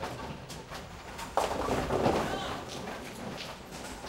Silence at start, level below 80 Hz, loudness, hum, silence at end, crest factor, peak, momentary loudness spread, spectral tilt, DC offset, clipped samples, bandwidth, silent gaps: 0 s; -50 dBFS; -35 LUFS; none; 0 s; 22 dB; -12 dBFS; 14 LU; -4.5 dB/octave; under 0.1%; under 0.1%; 16 kHz; none